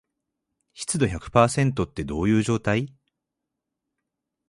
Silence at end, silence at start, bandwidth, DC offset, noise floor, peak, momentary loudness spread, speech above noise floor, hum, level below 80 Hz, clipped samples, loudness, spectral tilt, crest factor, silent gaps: 1.6 s; 0.75 s; 11.5 kHz; under 0.1%; -84 dBFS; -4 dBFS; 9 LU; 61 dB; none; -46 dBFS; under 0.1%; -23 LUFS; -5.5 dB/octave; 22 dB; none